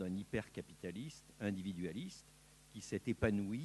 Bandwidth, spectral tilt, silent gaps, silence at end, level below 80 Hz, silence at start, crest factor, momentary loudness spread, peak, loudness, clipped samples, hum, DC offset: 12 kHz; -6 dB/octave; none; 0 s; -62 dBFS; 0 s; 22 dB; 19 LU; -20 dBFS; -43 LUFS; under 0.1%; none; under 0.1%